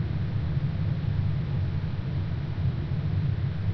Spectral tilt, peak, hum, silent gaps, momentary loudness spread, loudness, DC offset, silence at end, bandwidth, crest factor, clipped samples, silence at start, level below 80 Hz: -10 dB/octave; -16 dBFS; none; none; 3 LU; -29 LUFS; under 0.1%; 0 s; 5.8 kHz; 12 dB; under 0.1%; 0 s; -38 dBFS